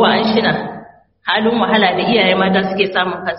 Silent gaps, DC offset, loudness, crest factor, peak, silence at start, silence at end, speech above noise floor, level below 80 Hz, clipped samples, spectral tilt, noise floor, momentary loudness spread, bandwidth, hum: none; under 0.1%; -14 LUFS; 16 dB; 0 dBFS; 0 s; 0 s; 25 dB; -52 dBFS; under 0.1%; -2.5 dB/octave; -39 dBFS; 10 LU; 5.8 kHz; none